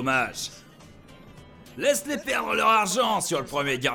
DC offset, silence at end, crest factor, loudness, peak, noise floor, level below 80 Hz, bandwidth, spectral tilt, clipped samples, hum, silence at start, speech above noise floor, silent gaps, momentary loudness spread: under 0.1%; 0 s; 18 dB; -24 LUFS; -10 dBFS; -49 dBFS; -58 dBFS; 19 kHz; -2.5 dB/octave; under 0.1%; none; 0 s; 24 dB; none; 11 LU